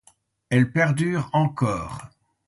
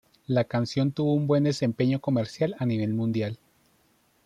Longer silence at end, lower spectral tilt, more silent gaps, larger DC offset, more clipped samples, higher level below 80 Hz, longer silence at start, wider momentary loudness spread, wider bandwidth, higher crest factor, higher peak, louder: second, 0.4 s vs 0.9 s; about the same, -7 dB/octave vs -7.5 dB/octave; neither; neither; neither; first, -52 dBFS vs -64 dBFS; first, 0.5 s vs 0.3 s; first, 12 LU vs 5 LU; about the same, 11.5 kHz vs 10.5 kHz; about the same, 18 dB vs 16 dB; first, -6 dBFS vs -12 dBFS; first, -23 LUFS vs -26 LUFS